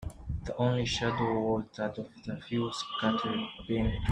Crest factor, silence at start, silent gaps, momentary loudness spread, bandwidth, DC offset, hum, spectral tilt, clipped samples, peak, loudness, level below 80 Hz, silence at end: 18 dB; 0 s; none; 10 LU; 10.5 kHz; under 0.1%; none; -6 dB/octave; under 0.1%; -14 dBFS; -32 LUFS; -46 dBFS; 0 s